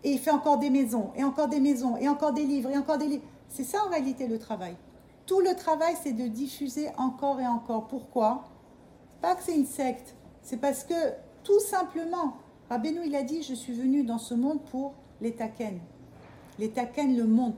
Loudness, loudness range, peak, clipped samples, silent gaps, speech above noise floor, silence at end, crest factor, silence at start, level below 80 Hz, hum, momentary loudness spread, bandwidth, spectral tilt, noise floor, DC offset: -29 LUFS; 4 LU; -12 dBFS; under 0.1%; none; 26 dB; 0 s; 18 dB; 0.05 s; -66 dBFS; none; 12 LU; 17.5 kHz; -5 dB/octave; -54 dBFS; under 0.1%